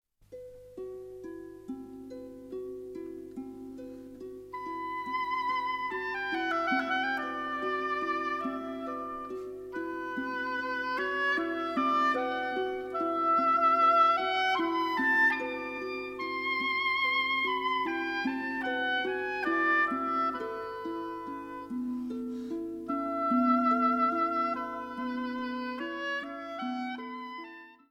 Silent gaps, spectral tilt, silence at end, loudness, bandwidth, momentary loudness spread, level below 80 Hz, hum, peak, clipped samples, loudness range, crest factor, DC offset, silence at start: none; -4.5 dB/octave; 0.15 s; -30 LUFS; 16 kHz; 18 LU; -68 dBFS; 50 Hz at -65 dBFS; -14 dBFS; under 0.1%; 11 LU; 18 dB; under 0.1%; 0.3 s